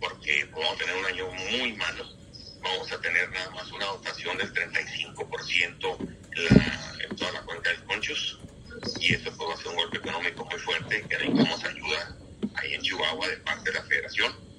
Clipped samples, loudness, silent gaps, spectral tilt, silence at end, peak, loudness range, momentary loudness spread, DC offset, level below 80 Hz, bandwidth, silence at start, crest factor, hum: under 0.1%; -28 LUFS; none; -4 dB/octave; 0 s; -2 dBFS; 3 LU; 10 LU; under 0.1%; -50 dBFS; 11 kHz; 0 s; 26 dB; none